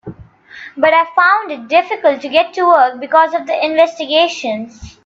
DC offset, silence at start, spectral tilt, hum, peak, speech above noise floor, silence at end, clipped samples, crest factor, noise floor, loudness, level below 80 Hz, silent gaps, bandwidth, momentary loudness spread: under 0.1%; 0.05 s; -3.5 dB/octave; none; 0 dBFS; 24 dB; 0.15 s; under 0.1%; 14 dB; -38 dBFS; -13 LUFS; -50 dBFS; none; 7.6 kHz; 11 LU